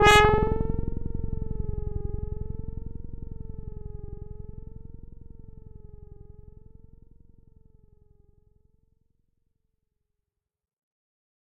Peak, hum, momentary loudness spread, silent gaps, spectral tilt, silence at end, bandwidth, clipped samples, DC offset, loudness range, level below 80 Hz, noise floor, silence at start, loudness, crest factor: -2 dBFS; none; 24 LU; none; -3 dB/octave; 5.1 s; 7.6 kHz; under 0.1%; under 0.1%; 22 LU; -38 dBFS; -88 dBFS; 0 s; -28 LUFS; 28 dB